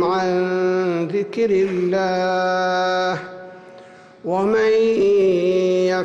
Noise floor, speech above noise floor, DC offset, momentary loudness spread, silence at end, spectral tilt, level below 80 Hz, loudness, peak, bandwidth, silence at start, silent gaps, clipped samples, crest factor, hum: -43 dBFS; 25 dB; under 0.1%; 8 LU; 0 s; -6 dB/octave; -58 dBFS; -19 LUFS; -10 dBFS; 7.8 kHz; 0 s; none; under 0.1%; 8 dB; none